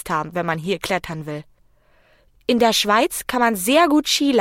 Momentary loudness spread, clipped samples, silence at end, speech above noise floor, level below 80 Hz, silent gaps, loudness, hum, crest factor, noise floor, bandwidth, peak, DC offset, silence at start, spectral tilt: 14 LU; under 0.1%; 0 s; 37 dB; -52 dBFS; none; -19 LUFS; none; 16 dB; -56 dBFS; 17 kHz; -4 dBFS; under 0.1%; 0.05 s; -3.5 dB/octave